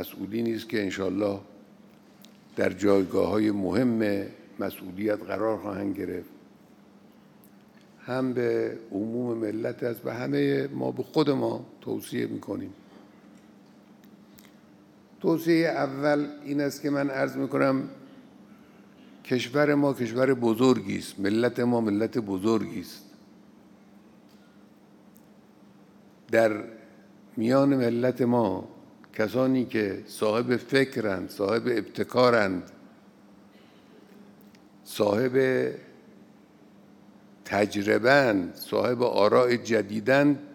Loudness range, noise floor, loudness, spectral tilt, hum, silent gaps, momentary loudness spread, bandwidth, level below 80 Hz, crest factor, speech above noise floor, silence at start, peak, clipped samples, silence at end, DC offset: 8 LU; -54 dBFS; -26 LUFS; -6 dB/octave; none; none; 13 LU; 18 kHz; -74 dBFS; 22 dB; 29 dB; 0 s; -6 dBFS; under 0.1%; 0 s; under 0.1%